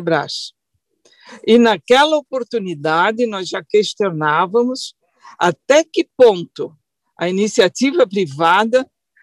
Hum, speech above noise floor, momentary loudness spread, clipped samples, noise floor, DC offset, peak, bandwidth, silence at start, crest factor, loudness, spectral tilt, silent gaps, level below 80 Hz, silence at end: none; 44 dB; 13 LU; under 0.1%; -60 dBFS; under 0.1%; -2 dBFS; 12 kHz; 0 s; 14 dB; -16 LUFS; -4.5 dB/octave; none; -64 dBFS; 0.4 s